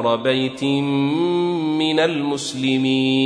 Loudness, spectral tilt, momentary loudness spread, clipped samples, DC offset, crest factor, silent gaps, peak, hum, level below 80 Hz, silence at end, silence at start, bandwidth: -19 LUFS; -5.5 dB/octave; 3 LU; under 0.1%; under 0.1%; 14 dB; none; -6 dBFS; none; -64 dBFS; 0 s; 0 s; 10.5 kHz